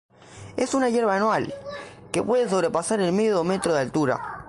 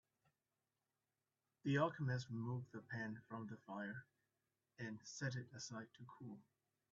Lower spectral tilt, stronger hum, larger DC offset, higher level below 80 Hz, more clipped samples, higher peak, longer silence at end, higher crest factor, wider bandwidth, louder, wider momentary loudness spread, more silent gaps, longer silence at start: about the same, -5 dB/octave vs -5.5 dB/octave; neither; neither; first, -58 dBFS vs -84 dBFS; neither; first, -6 dBFS vs -26 dBFS; second, 0 s vs 0.5 s; second, 18 dB vs 24 dB; first, 11.5 kHz vs 7.4 kHz; first, -23 LUFS vs -47 LUFS; second, 12 LU vs 17 LU; neither; second, 0.3 s vs 1.65 s